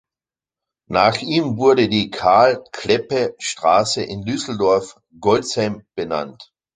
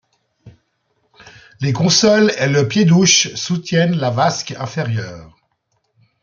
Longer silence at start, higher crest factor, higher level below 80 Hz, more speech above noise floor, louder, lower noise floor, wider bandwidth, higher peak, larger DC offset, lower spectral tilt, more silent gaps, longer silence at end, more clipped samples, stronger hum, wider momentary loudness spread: first, 0.9 s vs 0.45 s; about the same, 18 dB vs 16 dB; about the same, -52 dBFS vs -56 dBFS; first, over 72 dB vs 52 dB; second, -18 LUFS vs -15 LUFS; first, under -90 dBFS vs -67 dBFS; first, 9.6 kHz vs 7.4 kHz; about the same, -2 dBFS vs 0 dBFS; neither; about the same, -4.5 dB/octave vs -4 dB/octave; neither; second, 0.3 s vs 0.95 s; neither; neither; second, 10 LU vs 13 LU